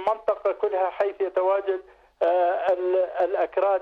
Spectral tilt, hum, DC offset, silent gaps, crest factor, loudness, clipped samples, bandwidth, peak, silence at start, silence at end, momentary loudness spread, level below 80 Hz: -5.5 dB/octave; none; under 0.1%; none; 12 dB; -24 LUFS; under 0.1%; 5.2 kHz; -12 dBFS; 0 s; 0 s; 4 LU; -66 dBFS